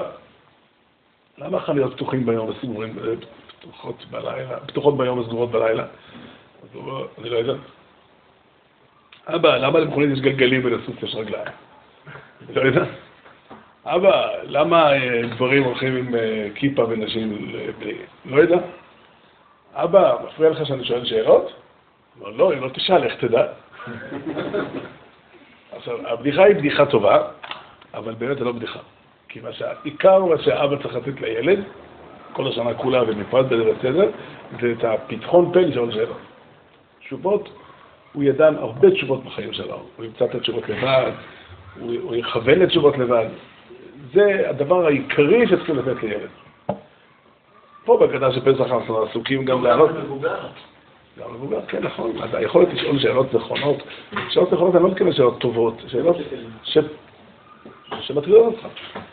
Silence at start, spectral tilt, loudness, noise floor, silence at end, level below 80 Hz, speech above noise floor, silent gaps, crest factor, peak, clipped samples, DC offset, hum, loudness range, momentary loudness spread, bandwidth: 0 s; -4 dB/octave; -20 LUFS; -60 dBFS; 0.05 s; -58 dBFS; 40 dB; none; 18 dB; -2 dBFS; under 0.1%; under 0.1%; none; 6 LU; 18 LU; 4.6 kHz